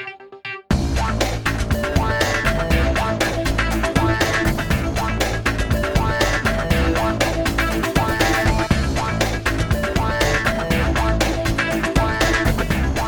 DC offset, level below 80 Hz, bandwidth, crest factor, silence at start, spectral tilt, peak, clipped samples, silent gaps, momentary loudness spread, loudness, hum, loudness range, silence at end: under 0.1%; -24 dBFS; over 20 kHz; 16 dB; 0 s; -5 dB/octave; -2 dBFS; under 0.1%; none; 3 LU; -19 LUFS; none; 1 LU; 0 s